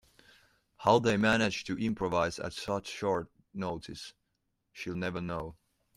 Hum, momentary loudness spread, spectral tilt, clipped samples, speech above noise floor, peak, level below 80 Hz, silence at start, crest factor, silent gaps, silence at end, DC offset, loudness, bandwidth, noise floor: none; 17 LU; -5 dB/octave; under 0.1%; 49 dB; -12 dBFS; -60 dBFS; 0.8 s; 22 dB; none; 0.45 s; under 0.1%; -32 LUFS; 13.5 kHz; -80 dBFS